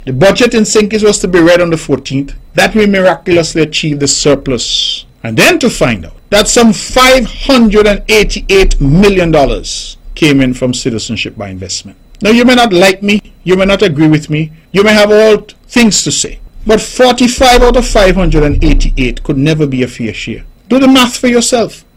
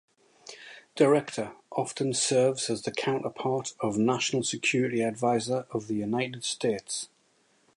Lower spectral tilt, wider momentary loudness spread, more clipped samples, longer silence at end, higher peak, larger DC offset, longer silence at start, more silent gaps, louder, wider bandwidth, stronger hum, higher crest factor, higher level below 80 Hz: about the same, -4 dB/octave vs -4 dB/octave; about the same, 11 LU vs 12 LU; first, 0.3% vs under 0.1%; second, 0.2 s vs 0.7 s; first, 0 dBFS vs -10 dBFS; neither; second, 0 s vs 0.45 s; neither; first, -9 LUFS vs -28 LUFS; first, 16.5 kHz vs 11.5 kHz; neither; second, 8 dB vs 20 dB; first, -20 dBFS vs -70 dBFS